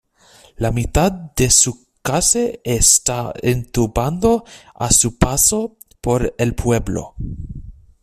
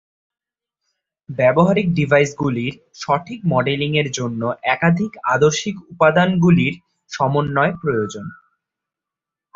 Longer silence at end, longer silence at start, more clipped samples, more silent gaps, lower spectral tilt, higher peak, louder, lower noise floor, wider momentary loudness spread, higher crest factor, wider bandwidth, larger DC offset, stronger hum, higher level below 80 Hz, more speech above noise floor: second, 0.3 s vs 1.25 s; second, 0.6 s vs 1.3 s; neither; neither; second, -3.5 dB/octave vs -6 dB/octave; about the same, 0 dBFS vs -2 dBFS; about the same, -16 LUFS vs -18 LUFS; second, -49 dBFS vs -87 dBFS; about the same, 15 LU vs 13 LU; about the same, 18 dB vs 18 dB; first, 15.5 kHz vs 7.8 kHz; neither; neither; first, -32 dBFS vs -52 dBFS; second, 32 dB vs 69 dB